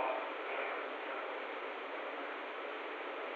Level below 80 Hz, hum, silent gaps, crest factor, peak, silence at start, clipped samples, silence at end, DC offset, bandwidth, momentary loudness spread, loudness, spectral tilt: under -90 dBFS; none; none; 16 dB; -26 dBFS; 0 s; under 0.1%; 0 s; under 0.1%; 8 kHz; 4 LU; -41 LUFS; -2.5 dB/octave